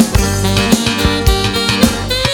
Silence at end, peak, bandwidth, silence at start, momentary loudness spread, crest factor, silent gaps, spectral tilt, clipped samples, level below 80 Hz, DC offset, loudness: 0 s; 0 dBFS; over 20 kHz; 0 s; 2 LU; 12 dB; none; -4 dB/octave; 0.2%; -20 dBFS; under 0.1%; -13 LUFS